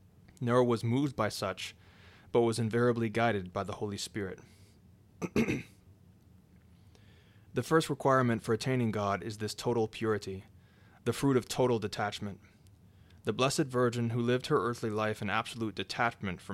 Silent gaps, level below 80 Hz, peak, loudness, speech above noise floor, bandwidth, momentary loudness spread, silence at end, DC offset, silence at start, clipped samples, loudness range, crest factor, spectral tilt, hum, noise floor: none; -64 dBFS; -14 dBFS; -32 LUFS; 29 dB; 15.5 kHz; 11 LU; 0 s; under 0.1%; 0.4 s; under 0.1%; 7 LU; 20 dB; -5.5 dB/octave; none; -60 dBFS